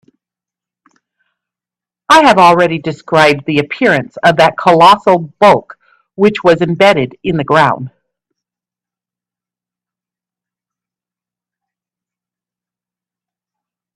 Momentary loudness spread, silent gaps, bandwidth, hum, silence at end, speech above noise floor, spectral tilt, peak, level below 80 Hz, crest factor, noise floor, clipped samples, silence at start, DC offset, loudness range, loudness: 9 LU; none; 14.5 kHz; 60 Hz at -45 dBFS; 6.1 s; 79 dB; -5.5 dB/octave; 0 dBFS; -52 dBFS; 14 dB; -88 dBFS; under 0.1%; 2.1 s; under 0.1%; 8 LU; -10 LUFS